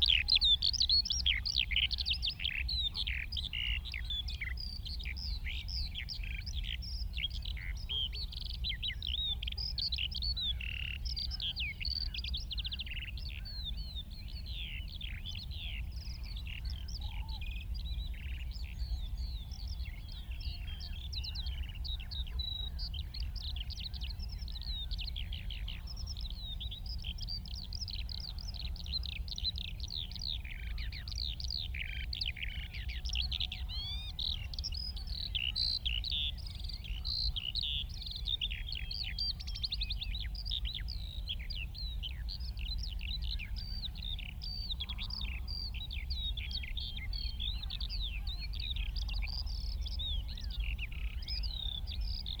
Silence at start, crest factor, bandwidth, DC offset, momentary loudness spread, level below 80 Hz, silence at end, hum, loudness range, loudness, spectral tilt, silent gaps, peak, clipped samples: 0 s; 20 dB; over 20 kHz; under 0.1%; 9 LU; -40 dBFS; 0 s; none; 7 LU; -37 LUFS; -3 dB/octave; none; -16 dBFS; under 0.1%